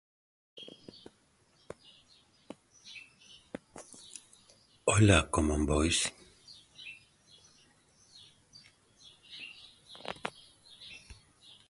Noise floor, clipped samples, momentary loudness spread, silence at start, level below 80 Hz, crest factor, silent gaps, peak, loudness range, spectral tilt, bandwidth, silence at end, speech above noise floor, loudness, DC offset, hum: -68 dBFS; under 0.1%; 29 LU; 0.55 s; -46 dBFS; 28 dB; none; -8 dBFS; 22 LU; -4.5 dB/octave; 11.5 kHz; 0.55 s; 41 dB; -29 LUFS; under 0.1%; none